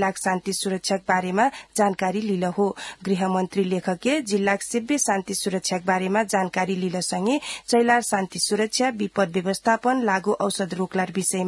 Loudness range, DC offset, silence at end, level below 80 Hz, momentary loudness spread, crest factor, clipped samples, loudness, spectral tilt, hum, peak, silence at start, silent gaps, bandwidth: 2 LU; under 0.1%; 0 s; -64 dBFS; 4 LU; 16 dB; under 0.1%; -23 LUFS; -4 dB/octave; none; -6 dBFS; 0 s; none; 12 kHz